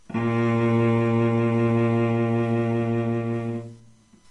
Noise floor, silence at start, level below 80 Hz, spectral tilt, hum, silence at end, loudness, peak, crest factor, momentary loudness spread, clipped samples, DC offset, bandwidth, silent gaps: -53 dBFS; 0.1 s; -58 dBFS; -9 dB/octave; none; 0.55 s; -23 LUFS; -10 dBFS; 12 dB; 7 LU; under 0.1%; under 0.1%; 8.2 kHz; none